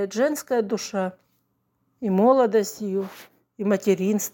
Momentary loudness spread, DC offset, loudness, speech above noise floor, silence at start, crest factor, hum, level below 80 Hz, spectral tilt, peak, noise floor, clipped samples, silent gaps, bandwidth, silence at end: 12 LU; under 0.1%; -23 LUFS; 49 dB; 0 s; 18 dB; none; -72 dBFS; -5.5 dB/octave; -6 dBFS; -71 dBFS; under 0.1%; none; 17 kHz; 0.05 s